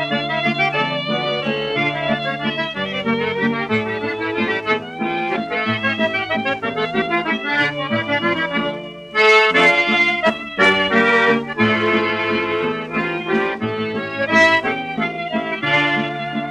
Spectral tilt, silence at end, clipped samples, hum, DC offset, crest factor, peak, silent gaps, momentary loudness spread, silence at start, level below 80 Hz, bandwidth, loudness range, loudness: -5 dB/octave; 0 s; under 0.1%; none; under 0.1%; 16 dB; -2 dBFS; none; 10 LU; 0 s; -54 dBFS; 11 kHz; 6 LU; -18 LUFS